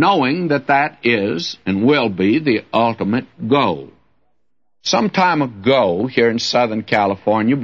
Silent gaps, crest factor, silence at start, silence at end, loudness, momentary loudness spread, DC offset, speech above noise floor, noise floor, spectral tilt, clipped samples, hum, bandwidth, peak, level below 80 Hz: none; 16 dB; 0 s; 0 s; -17 LUFS; 6 LU; 0.1%; 58 dB; -74 dBFS; -5.5 dB/octave; under 0.1%; none; 7.4 kHz; -2 dBFS; -58 dBFS